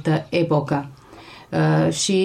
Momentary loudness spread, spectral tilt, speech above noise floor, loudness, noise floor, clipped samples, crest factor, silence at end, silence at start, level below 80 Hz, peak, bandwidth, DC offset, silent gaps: 13 LU; -5.5 dB/octave; 24 dB; -21 LUFS; -43 dBFS; under 0.1%; 12 dB; 0 s; 0 s; -56 dBFS; -8 dBFS; 12 kHz; under 0.1%; none